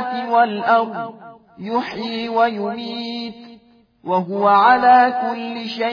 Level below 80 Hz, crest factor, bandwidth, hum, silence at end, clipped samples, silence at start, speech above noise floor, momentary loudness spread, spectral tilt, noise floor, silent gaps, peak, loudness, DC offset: -64 dBFS; 16 dB; 5.2 kHz; none; 0 s; under 0.1%; 0 s; 33 dB; 17 LU; -6.5 dB/octave; -50 dBFS; none; -2 dBFS; -18 LUFS; under 0.1%